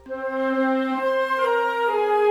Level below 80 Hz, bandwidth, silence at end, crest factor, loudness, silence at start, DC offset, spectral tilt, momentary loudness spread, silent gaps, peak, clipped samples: -64 dBFS; 13.5 kHz; 0 s; 12 dB; -22 LUFS; 0.05 s; under 0.1%; -4 dB/octave; 3 LU; none; -10 dBFS; under 0.1%